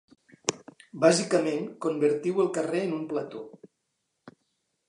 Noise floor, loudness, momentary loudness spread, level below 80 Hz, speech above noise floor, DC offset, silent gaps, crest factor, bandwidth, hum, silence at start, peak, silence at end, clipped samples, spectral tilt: -79 dBFS; -27 LUFS; 16 LU; -80 dBFS; 53 dB; under 0.1%; none; 26 dB; 11 kHz; none; 0.45 s; -4 dBFS; 0.6 s; under 0.1%; -4.5 dB/octave